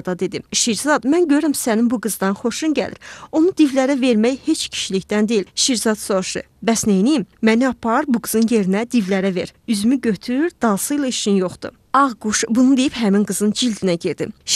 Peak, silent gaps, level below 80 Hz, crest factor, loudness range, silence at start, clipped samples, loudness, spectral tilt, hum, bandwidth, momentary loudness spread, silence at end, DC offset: -4 dBFS; none; -54 dBFS; 14 dB; 1 LU; 0.05 s; under 0.1%; -18 LUFS; -4 dB/octave; none; 14.5 kHz; 7 LU; 0 s; under 0.1%